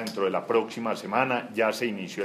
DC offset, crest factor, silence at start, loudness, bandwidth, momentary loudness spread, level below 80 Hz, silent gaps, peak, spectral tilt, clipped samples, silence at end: under 0.1%; 20 dB; 0 s; -27 LUFS; 15.5 kHz; 5 LU; -78 dBFS; none; -8 dBFS; -4.5 dB/octave; under 0.1%; 0 s